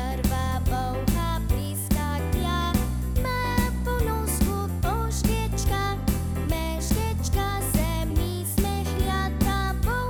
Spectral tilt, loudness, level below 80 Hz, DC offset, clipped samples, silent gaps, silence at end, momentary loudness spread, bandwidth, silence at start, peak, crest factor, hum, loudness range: -5.5 dB/octave; -26 LUFS; -28 dBFS; under 0.1%; under 0.1%; none; 0 s; 2 LU; over 20 kHz; 0 s; -8 dBFS; 16 dB; none; 0 LU